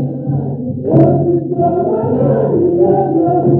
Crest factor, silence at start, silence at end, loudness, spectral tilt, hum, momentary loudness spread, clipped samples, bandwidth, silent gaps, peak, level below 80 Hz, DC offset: 12 dB; 0 s; 0 s; -13 LUFS; -14 dB/octave; none; 8 LU; under 0.1%; 2.8 kHz; none; 0 dBFS; -46 dBFS; under 0.1%